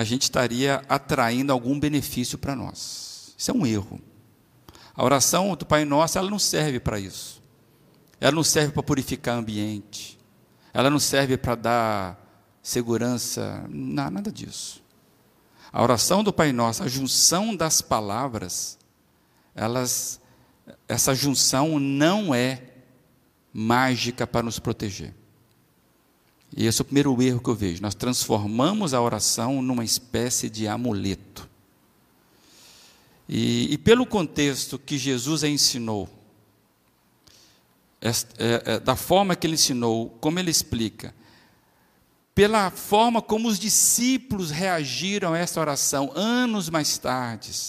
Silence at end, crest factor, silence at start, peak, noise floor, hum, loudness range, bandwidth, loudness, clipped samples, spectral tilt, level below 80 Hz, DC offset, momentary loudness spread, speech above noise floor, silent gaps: 0 s; 22 dB; 0 s; -4 dBFS; -63 dBFS; none; 6 LU; 15.5 kHz; -23 LUFS; under 0.1%; -3.5 dB/octave; -52 dBFS; under 0.1%; 13 LU; 40 dB; none